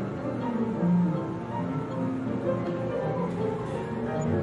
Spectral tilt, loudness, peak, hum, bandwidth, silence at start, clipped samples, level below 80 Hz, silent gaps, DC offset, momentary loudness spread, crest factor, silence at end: -9 dB/octave; -29 LUFS; -16 dBFS; none; 8.2 kHz; 0 s; under 0.1%; -56 dBFS; none; under 0.1%; 7 LU; 12 dB; 0 s